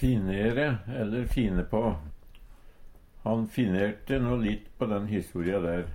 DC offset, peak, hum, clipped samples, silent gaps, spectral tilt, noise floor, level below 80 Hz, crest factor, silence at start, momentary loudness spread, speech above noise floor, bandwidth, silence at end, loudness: under 0.1%; -14 dBFS; none; under 0.1%; none; -8 dB/octave; -49 dBFS; -40 dBFS; 16 dB; 0 s; 5 LU; 21 dB; 16.5 kHz; 0 s; -29 LUFS